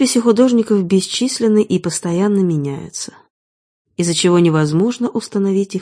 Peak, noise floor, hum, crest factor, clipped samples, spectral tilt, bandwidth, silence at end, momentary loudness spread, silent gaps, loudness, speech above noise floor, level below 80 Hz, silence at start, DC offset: 0 dBFS; under -90 dBFS; none; 16 dB; under 0.1%; -5.5 dB/octave; 10.5 kHz; 0 s; 12 LU; 3.30-3.85 s; -15 LUFS; over 75 dB; -58 dBFS; 0 s; under 0.1%